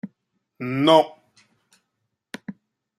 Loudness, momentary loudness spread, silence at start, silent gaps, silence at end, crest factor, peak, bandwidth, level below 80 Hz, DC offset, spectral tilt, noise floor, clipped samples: -19 LUFS; 25 LU; 0.05 s; none; 0.5 s; 24 dB; -2 dBFS; 12.5 kHz; -72 dBFS; under 0.1%; -6 dB/octave; -78 dBFS; under 0.1%